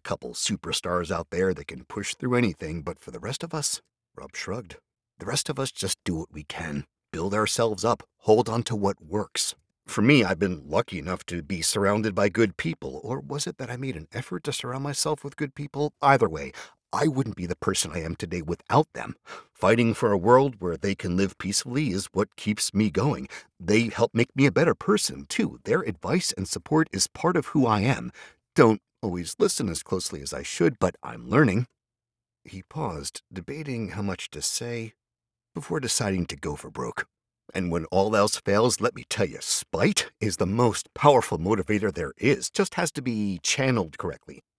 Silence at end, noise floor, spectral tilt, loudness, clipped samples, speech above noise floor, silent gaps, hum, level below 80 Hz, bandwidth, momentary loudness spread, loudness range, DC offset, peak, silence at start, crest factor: 0.2 s; under -90 dBFS; -4.5 dB/octave; -26 LUFS; under 0.1%; over 64 dB; none; none; -54 dBFS; 11 kHz; 14 LU; 7 LU; under 0.1%; -2 dBFS; 0.05 s; 24 dB